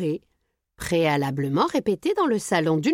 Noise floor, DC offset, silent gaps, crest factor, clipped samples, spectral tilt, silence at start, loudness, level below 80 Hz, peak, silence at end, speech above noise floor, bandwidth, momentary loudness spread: -65 dBFS; under 0.1%; none; 16 dB; under 0.1%; -5.5 dB/octave; 0 s; -23 LUFS; -54 dBFS; -8 dBFS; 0 s; 43 dB; 16.5 kHz; 7 LU